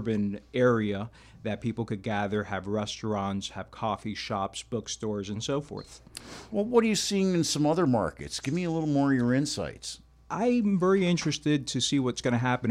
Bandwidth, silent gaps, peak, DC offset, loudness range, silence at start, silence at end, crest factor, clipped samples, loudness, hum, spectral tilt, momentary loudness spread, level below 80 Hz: 15 kHz; none; -8 dBFS; under 0.1%; 6 LU; 0 s; 0 s; 20 dB; under 0.1%; -28 LUFS; none; -5 dB/octave; 12 LU; -56 dBFS